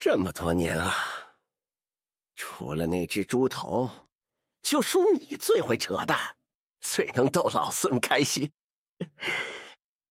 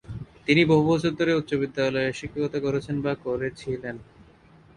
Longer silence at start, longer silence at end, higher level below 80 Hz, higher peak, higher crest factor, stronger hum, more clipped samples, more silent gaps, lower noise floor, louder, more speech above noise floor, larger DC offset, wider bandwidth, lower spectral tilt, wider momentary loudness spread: about the same, 0 s vs 0.1 s; second, 0.35 s vs 0.75 s; second, -58 dBFS vs -52 dBFS; about the same, -8 dBFS vs -6 dBFS; about the same, 20 dB vs 18 dB; neither; neither; first, 6.55-6.64 s, 8.61-8.94 s vs none; first, under -90 dBFS vs -53 dBFS; about the same, -27 LUFS vs -25 LUFS; first, over 63 dB vs 29 dB; neither; first, 17 kHz vs 11 kHz; second, -4 dB/octave vs -6.5 dB/octave; about the same, 13 LU vs 14 LU